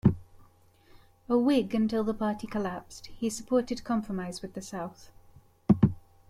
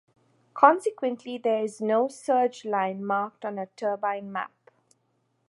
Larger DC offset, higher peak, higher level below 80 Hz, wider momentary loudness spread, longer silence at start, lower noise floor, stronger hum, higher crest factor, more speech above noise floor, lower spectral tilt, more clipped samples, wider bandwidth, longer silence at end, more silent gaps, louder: neither; second, -8 dBFS vs -4 dBFS; first, -52 dBFS vs -82 dBFS; about the same, 14 LU vs 14 LU; second, 0.05 s vs 0.55 s; second, -59 dBFS vs -72 dBFS; neither; about the same, 22 dB vs 24 dB; second, 29 dB vs 46 dB; first, -7 dB/octave vs -5.5 dB/octave; neither; first, 14.5 kHz vs 11.5 kHz; second, 0.3 s vs 1.05 s; neither; second, -29 LUFS vs -26 LUFS